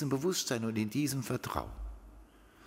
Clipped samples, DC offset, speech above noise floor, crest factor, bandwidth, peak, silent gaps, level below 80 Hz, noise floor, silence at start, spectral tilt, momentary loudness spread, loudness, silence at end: under 0.1%; under 0.1%; 23 dB; 20 dB; 16 kHz; -16 dBFS; none; -50 dBFS; -57 dBFS; 0 s; -4.5 dB/octave; 16 LU; -34 LUFS; 0 s